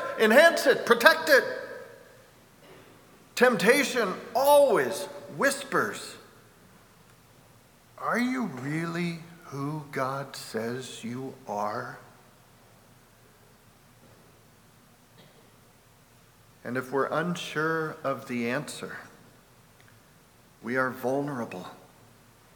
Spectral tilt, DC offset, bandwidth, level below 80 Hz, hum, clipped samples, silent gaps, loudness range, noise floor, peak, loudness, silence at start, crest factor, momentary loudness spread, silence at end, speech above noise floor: -4 dB/octave; under 0.1%; over 20 kHz; -70 dBFS; none; under 0.1%; none; 13 LU; -58 dBFS; 0 dBFS; -26 LUFS; 0 s; 28 dB; 21 LU; 0.8 s; 32 dB